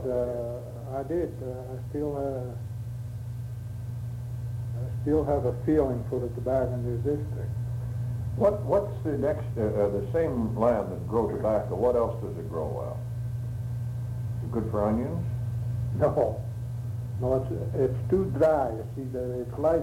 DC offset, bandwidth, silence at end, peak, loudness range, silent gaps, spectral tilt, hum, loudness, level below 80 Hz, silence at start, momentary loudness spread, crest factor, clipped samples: under 0.1%; 15 kHz; 0 s; -10 dBFS; 6 LU; none; -9.5 dB/octave; none; -29 LUFS; -44 dBFS; 0 s; 10 LU; 18 dB; under 0.1%